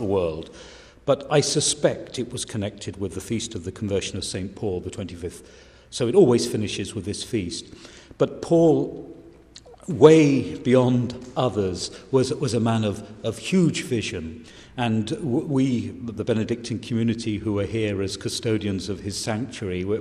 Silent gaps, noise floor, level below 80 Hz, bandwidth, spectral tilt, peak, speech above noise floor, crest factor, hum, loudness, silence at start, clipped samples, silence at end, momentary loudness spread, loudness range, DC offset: none; -47 dBFS; -52 dBFS; 14.5 kHz; -5.5 dB/octave; 0 dBFS; 24 dB; 22 dB; none; -23 LUFS; 0 s; under 0.1%; 0 s; 15 LU; 6 LU; under 0.1%